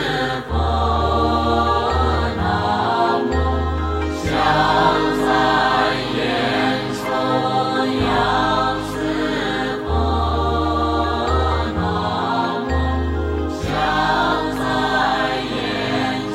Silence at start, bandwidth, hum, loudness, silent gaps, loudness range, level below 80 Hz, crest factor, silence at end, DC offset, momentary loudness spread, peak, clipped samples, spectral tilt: 0 s; 13 kHz; none; -19 LUFS; none; 2 LU; -28 dBFS; 16 dB; 0 s; under 0.1%; 6 LU; -4 dBFS; under 0.1%; -6 dB/octave